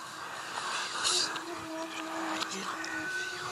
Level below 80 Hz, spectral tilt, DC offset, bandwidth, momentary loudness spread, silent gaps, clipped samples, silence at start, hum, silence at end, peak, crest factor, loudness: -76 dBFS; -0.5 dB/octave; under 0.1%; 15.5 kHz; 10 LU; none; under 0.1%; 0 s; none; 0 s; -16 dBFS; 20 dB; -33 LUFS